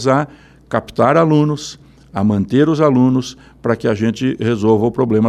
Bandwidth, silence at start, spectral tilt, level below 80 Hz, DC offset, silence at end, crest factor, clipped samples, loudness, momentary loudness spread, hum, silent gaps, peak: 11 kHz; 0 s; -7 dB/octave; -48 dBFS; under 0.1%; 0 s; 14 dB; under 0.1%; -15 LUFS; 12 LU; none; none; 0 dBFS